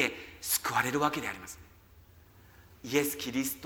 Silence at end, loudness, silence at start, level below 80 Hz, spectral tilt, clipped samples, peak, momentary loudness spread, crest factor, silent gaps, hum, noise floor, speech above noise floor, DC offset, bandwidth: 0 s; -31 LUFS; 0 s; -62 dBFS; -3 dB/octave; under 0.1%; -10 dBFS; 17 LU; 22 dB; none; none; -57 dBFS; 25 dB; under 0.1%; 18.5 kHz